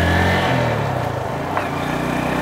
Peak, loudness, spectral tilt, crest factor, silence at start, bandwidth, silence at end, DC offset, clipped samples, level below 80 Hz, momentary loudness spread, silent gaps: -4 dBFS; -20 LUFS; -6 dB/octave; 16 dB; 0 s; 16 kHz; 0 s; under 0.1%; under 0.1%; -40 dBFS; 6 LU; none